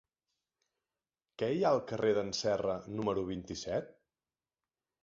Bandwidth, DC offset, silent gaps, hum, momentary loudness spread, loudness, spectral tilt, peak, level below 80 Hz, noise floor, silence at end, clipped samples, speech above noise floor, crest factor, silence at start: 7.6 kHz; under 0.1%; none; none; 8 LU; -34 LUFS; -4.5 dB/octave; -16 dBFS; -64 dBFS; under -90 dBFS; 1.1 s; under 0.1%; over 57 dB; 20 dB; 1.4 s